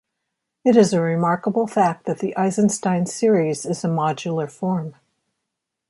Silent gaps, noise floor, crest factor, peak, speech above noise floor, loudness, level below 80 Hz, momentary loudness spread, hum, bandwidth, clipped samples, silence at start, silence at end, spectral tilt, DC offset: none; -81 dBFS; 18 dB; -2 dBFS; 61 dB; -20 LUFS; -66 dBFS; 9 LU; none; 11.5 kHz; under 0.1%; 0.65 s; 1 s; -6 dB/octave; under 0.1%